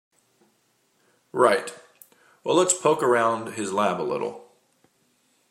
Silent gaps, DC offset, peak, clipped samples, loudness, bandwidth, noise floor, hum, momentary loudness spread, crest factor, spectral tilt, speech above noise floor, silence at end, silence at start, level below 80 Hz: none; under 0.1%; -4 dBFS; under 0.1%; -23 LUFS; 16 kHz; -67 dBFS; none; 13 LU; 22 dB; -3.5 dB/octave; 45 dB; 1.1 s; 1.35 s; -76 dBFS